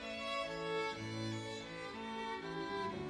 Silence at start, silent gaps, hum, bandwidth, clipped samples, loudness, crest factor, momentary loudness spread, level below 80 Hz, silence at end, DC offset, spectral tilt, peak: 0 s; none; none; 13 kHz; under 0.1%; -42 LUFS; 14 dB; 6 LU; -68 dBFS; 0 s; under 0.1%; -4.5 dB/octave; -28 dBFS